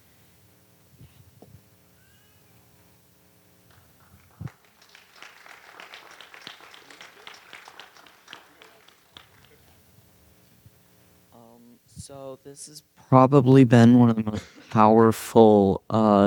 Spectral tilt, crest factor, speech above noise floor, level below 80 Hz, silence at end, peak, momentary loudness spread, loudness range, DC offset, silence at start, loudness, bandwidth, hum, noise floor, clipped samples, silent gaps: -8 dB/octave; 22 dB; 41 dB; -62 dBFS; 0 s; -2 dBFS; 28 LU; 28 LU; under 0.1%; 4.4 s; -18 LUFS; 19.5 kHz; none; -59 dBFS; under 0.1%; none